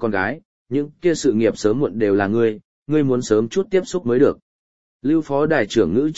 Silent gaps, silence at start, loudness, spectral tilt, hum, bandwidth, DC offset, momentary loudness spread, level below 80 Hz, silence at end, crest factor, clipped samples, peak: 0.45-0.66 s, 2.65-2.86 s, 4.42-5.00 s; 0 s; -19 LUFS; -6 dB/octave; none; 8.2 kHz; 0.9%; 8 LU; -52 dBFS; 0 s; 16 dB; under 0.1%; -2 dBFS